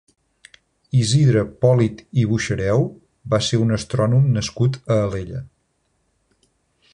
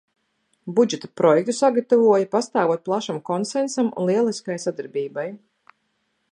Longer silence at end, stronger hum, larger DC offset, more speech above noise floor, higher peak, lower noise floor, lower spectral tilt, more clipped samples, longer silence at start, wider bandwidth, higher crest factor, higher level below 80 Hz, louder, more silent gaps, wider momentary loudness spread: first, 1.45 s vs 0.95 s; neither; neither; about the same, 50 dB vs 51 dB; about the same, -4 dBFS vs -4 dBFS; about the same, -68 dBFS vs -71 dBFS; about the same, -6.5 dB/octave vs -5.5 dB/octave; neither; first, 0.95 s vs 0.65 s; about the same, 10.5 kHz vs 11 kHz; about the same, 16 dB vs 18 dB; first, -46 dBFS vs -76 dBFS; about the same, -19 LUFS vs -21 LUFS; neither; about the same, 9 LU vs 11 LU